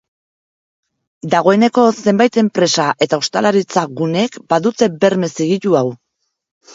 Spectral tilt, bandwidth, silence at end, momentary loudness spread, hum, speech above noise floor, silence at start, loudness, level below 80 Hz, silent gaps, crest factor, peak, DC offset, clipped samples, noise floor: -5 dB/octave; 7.8 kHz; 0.8 s; 6 LU; none; over 76 dB; 1.25 s; -15 LUFS; -62 dBFS; none; 16 dB; 0 dBFS; under 0.1%; under 0.1%; under -90 dBFS